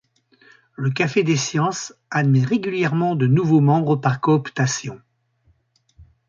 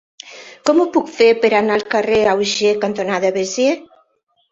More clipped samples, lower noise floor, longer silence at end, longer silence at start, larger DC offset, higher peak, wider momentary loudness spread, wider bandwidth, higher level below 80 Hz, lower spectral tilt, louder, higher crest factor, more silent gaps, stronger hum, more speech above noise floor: neither; about the same, -62 dBFS vs -63 dBFS; second, 0.25 s vs 0.65 s; first, 0.8 s vs 0.25 s; neither; about the same, -4 dBFS vs -2 dBFS; about the same, 9 LU vs 9 LU; about the same, 7.6 kHz vs 7.8 kHz; about the same, -60 dBFS vs -56 dBFS; first, -6 dB/octave vs -3.5 dB/octave; second, -20 LUFS vs -16 LUFS; about the same, 16 dB vs 16 dB; neither; neither; second, 43 dB vs 47 dB